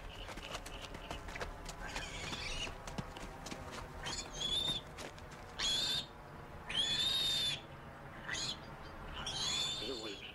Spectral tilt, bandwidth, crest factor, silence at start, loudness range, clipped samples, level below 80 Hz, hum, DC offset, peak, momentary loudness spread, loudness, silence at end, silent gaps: -2 dB/octave; 16 kHz; 16 dB; 0 s; 8 LU; under 0.1%; -54 dBFS; none; under 0.1%; -26 dBFS; 17 LU; -38 LUFS; 0 s; none